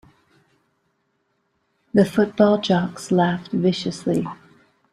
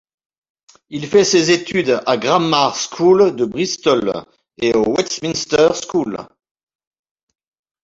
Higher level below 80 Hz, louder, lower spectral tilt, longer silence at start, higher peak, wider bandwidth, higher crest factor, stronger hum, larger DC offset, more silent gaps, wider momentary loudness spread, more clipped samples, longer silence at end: second, -60 dBFS vs -54 dBFS; second, -20 LUFS vs -16 LUFS; first, -6.5 dB/octave vs -4 dB/octave; first, 1.95 s vs 0.9 s; about the same, -2 dBFS vs 0 dBFS; first, 12 kHz vs 7.8 kHz; about the same, 20 dB vs 16 dB; neither; neither; neither; second, 7 LU vs 10 LU; neither; second, 0.6 s vs 1.6 s